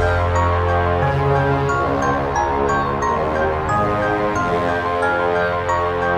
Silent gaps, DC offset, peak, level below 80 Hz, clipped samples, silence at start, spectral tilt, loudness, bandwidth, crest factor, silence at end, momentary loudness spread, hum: none; under 0.1%; -4 dBFS; -32 dBFS; under 0.1%; 0 s; -6.5 dB/octave; -18 LUFS; 9.2 kHz; 14 dB; 0 s; 2 LU; none